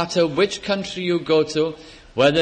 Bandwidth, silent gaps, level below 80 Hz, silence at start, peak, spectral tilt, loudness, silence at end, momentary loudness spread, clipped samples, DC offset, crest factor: 9.8 kHz; none; -52 dBFS; 0 s; -4 dBFS; -5 dB/octave; -21 LUFS; 0 s; 7 LU; under 0.1%; under 0.1%; 16 dB